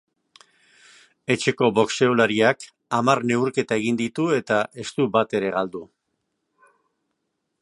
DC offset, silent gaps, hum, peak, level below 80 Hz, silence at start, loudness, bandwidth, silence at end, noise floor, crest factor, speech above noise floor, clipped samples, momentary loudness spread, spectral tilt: under 0.1%; none; none; -2 dBFS; -66 dBFS; 1.3 s; -22 LUFS; 11.5 kHz; 1.8 s; -77 dBFS; 22 dB; 55 dB; under 0.1%; 9 LU; -5 dB/octave